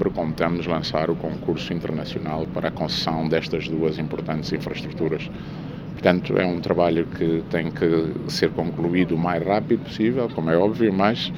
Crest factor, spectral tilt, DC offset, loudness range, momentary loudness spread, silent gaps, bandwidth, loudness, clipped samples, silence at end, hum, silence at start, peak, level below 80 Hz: 20 dB; -7 dB/octave; under 0.1%; 3 LU; 7 LU; none; 16 kHz; -23 LUFS; under 0.1%; 0 s; none; 0 s; -2 dBFS; -46 dBFS